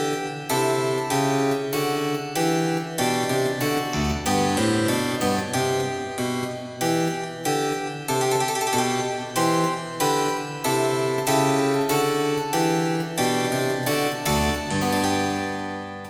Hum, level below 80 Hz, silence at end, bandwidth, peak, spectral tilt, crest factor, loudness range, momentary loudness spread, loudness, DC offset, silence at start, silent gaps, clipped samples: none; -46 dBFS; 0 s; 17.5 kHz; -8 dBFS; -4 dB/octave; 16 dB; 2 LU; 5 LU; -23 LUFS; under 0.1%; 0 s; none; under 0.1%